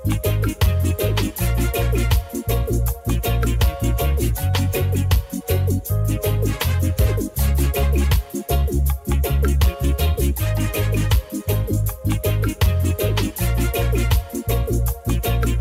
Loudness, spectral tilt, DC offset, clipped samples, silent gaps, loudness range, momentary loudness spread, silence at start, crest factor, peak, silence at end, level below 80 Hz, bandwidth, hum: -21 LUFS; -5.5 dB/octave; under 0.1%; under 0.1%; none; 1 LU; 3 LU; 0 s; 12 dB; -6 dBFS; 0 s; -22 dBFS; 16.5 kHz; none